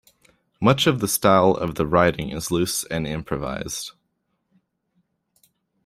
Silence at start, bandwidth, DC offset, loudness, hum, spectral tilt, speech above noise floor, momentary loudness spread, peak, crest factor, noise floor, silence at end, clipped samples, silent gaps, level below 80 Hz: 0.6 s; 16 kHz; under 0.1%; -21 LUFS; none; -4.5 dB/octave; 53 dB; 11 LU; -2 dBFS; 22 dB; -73 dBFS; 1.95 s; under 0.1%; none; -48 dBFS